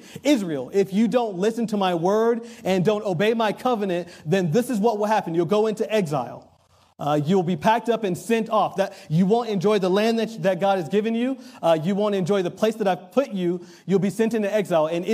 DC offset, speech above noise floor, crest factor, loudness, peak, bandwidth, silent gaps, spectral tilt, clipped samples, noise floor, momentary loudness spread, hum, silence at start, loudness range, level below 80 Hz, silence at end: under 0.1%; 31 dB; 16 dB; -22 LUFS; -6 dBFS; 15.5 kHz; none; -6.5 dB/octave; under 0.1%; -53 dBFS; 5 LU; none; 0.05 s; 2 LU; -70 dBFS; 0 s